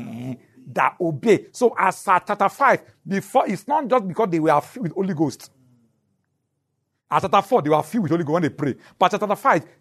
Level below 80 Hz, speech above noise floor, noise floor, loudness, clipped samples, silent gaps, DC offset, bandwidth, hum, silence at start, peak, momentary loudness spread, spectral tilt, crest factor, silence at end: -68 dBFS; 54 dB; -75 dBFS; -21 LUFS; under 0.1%; none; under 0.1%; 13.5 kHz; none; 0 s; -4 dBFS; 9 LU; -6 dB/octave; 18 dB; 0.2 s